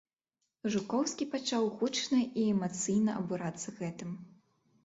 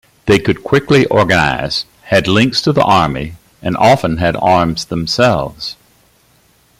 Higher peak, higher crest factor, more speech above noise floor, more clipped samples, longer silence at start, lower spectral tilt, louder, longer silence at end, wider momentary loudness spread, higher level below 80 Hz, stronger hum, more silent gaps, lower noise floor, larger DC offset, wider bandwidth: second, -20 dBFS vs 0 dBFS; about the same, 14 dB vs 14 dB; first, 53 dB vs 40 dB; neither; first, 0.65 s vs 0.25 s; about the same, -4.5 dB/octave vs -5.5 dB/octave; second, -33 LUFS vs -13 LUFS; second, 0.55 s vs 1.05 s; about the same, 10 LU vs 11 LU; second, -74 dBFS vs -38 dBFS; neither; neither; first, -85 dBFS vs -52 dBFS; neither; second, 8.2 kHz vs 16 kHz